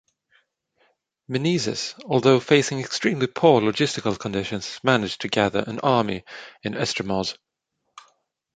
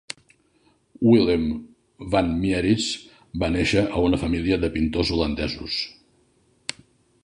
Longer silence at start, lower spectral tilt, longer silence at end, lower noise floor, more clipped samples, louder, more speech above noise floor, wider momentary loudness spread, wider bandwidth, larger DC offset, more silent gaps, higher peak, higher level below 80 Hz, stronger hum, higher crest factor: first, 1.3 s vs 1 s; about the same, -5 dB/octave vs -5.5 dB/octave; first, 1.25 s vs 0.5 s; first, -78 dBFS vs -62 dBFS; neither; about the same, -22 LUFS vs -23 LUFS; first, 55 dB vs 41 dB; second, 12 LU vs 16 LU; second, 9.4 kHz vs 11 kHz; neither; neither; first, -2 dBFS vs -6 dBFS; second, -58 dBFS vs -40 dBFS; neither; about the same, 22 dB vs 18 dB